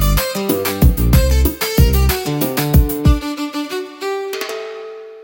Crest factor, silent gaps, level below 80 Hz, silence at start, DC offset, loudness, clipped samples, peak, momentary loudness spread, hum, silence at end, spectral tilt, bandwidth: 16 dB; none; -18 dBFS; 0 s; under 0.1%; -16 LUFS; under 0.1%; 0 dBFS; 11 LU; none; 0 s; -5.5 dB/octave; 17 kHz